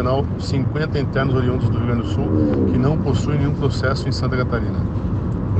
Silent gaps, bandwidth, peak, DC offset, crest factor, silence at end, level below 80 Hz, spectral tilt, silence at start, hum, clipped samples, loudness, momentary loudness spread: none; 8.4 kHz; -6 dBFS; under 0.1%; 14 dB; 0 s; -32 dBFS; -8 dB/octave; 0 s; none; under 0.1%; -20 LUFS; 5 LU